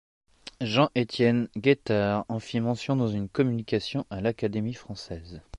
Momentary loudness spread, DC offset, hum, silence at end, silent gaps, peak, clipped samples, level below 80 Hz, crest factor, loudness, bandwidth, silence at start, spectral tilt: 14 LU; under 0.1%; none; 0 s; none; -8 dBFS; under 0.1%; -54 dBFS; 20 dB; -27 LUFS; 10.5 kHz; 0.45 s; -7 dB/octave